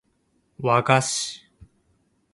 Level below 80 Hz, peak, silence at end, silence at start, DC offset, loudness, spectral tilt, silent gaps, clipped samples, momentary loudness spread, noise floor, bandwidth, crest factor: -62 dBFS; 0 dBFS; 0.95 s; 0.6 s; under 0.1%; -22 LUFS; -3.5 dB/octave; none; under 0.1%; 13 LU; -68 dBFS; 11.5 kHz; 24 dB